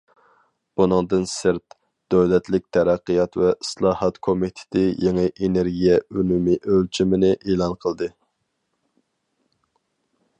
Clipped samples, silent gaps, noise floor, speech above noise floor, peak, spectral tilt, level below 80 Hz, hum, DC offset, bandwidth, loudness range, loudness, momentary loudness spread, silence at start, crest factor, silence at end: under 0.1%; none; -74 dBFS; 54 dB; -4 dBFS; -6.5 dB/octave; -48 dBFS; none; under 0.1%; 11 kHz; 3 LU; -21 LUFS; 6 LU; 0.8 s; 18 dB; 2.3 s